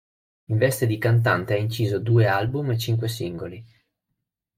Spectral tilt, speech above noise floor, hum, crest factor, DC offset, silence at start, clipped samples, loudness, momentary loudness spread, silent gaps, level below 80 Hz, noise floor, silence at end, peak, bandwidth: -6.5 dB/octave; 59 dB; none; 16 dB; under 0.1%; 0.5 s; under 0.1%; -23 LUFS; 10 LU; none; -56 dBFS; -81 dBFS; 0.95 s; -6 dBFS; 16 kHz